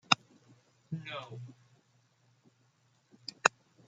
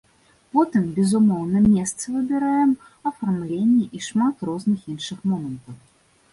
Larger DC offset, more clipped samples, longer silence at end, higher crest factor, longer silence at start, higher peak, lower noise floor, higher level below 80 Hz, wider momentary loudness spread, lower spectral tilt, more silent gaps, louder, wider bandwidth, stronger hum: neither; neither; second, 0.4 s vs 0.55 s; first, 36 dB vs 16 dB; second, 0.1 s vs 0.55 s; first, -2 dBFS vs -6 dBFS; first, -71 dBFS vs -56 dBFS; second, -78 dBFS vs -54 dBFS; first, 19 LU vs 9 LU; second, -2 dB/octave vs -6 dB/octave; neither; second, -33 LUFS vs -22 LUFS; second, 9.4 kHz vs 11.5 kHz; neither